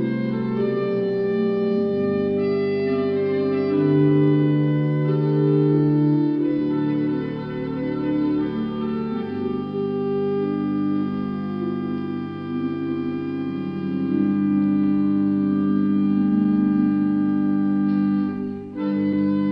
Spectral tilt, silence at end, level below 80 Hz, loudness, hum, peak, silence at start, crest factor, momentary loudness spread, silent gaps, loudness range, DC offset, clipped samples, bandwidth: -11 dB/octave; 0 s; -60 dBFS; -22 LUFS; none; -8 dBFS; 0 s; 14 dB; 8 LU; none; 6 LU; under 0.1%; under 0.1%; 5.2 kHz